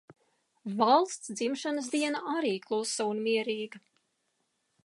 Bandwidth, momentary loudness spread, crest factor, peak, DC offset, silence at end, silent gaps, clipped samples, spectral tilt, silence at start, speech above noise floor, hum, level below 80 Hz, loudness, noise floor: 11.5 kHz; 12 LU; 20 dB; -10 dBFS; under 0.1%; 1.05 s; none; under 0.1%; -3.5 dB/octave; 0.1 s; 48 dB; none; -86 dBFS; -30 LUFS; -78 dBFS